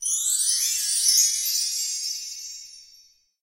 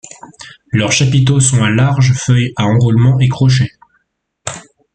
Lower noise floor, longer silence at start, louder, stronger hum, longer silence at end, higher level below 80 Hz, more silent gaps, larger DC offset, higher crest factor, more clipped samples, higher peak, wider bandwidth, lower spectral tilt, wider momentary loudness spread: second, -56 dBFS vs -63 dBFS; second, 0 s vs 0.4 s; second, -21 LUFS vs -12 LUFS; neither; first, 0.6 s vs 0.35 s; second, -68 dBFS vs -42 dBFS; neither; neither; first, 20 dB vs 12 dB; neither; second, -4 dBFS vs 0 dBFS; first, 16 kHz vs 9.2 kHz; second, 7.5 dB/octave vs -5 dB/octave; about the same, 17 LU vs 15 LU